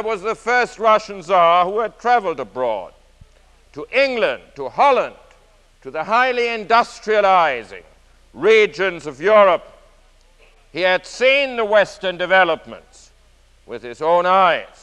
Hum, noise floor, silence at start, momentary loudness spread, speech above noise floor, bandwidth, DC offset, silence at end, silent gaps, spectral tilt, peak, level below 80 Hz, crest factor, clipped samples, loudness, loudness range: none; -52 dBFS; 0 s; 14 LU; 35 dB; 10.5 kHz; under 0.1%; 0.15 s; none; -3.5 dB/octave; -2 dBFS; -52 dBFS; 16 dB; under 0.1%; -17 LUFS; 4 LU